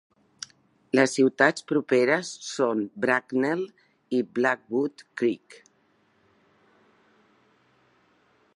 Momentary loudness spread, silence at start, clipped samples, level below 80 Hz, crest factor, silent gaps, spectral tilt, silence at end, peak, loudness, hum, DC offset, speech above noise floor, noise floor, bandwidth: 17 LU; 0.95 s; under 0.1%; -80 dBFS; 24 dB; none; -4.5 dB/octave; 3.05 s; -4 dBFS; -25 LUFS; none; under 0.1%; 41 dB; -66 dBFS; 11.5 kHz